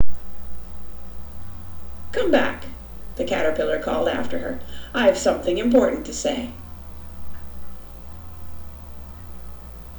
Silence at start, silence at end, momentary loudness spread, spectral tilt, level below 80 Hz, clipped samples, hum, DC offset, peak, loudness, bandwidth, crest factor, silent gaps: 0 s; 0 s; 20 LU; -4.5 dB/octave; -40 dBFS; under 0.1%; 60 Hz at -45 dBFS; under 0.1%; -6 dBFS; -22 LUFS; over 20 kHz; 16 dB; none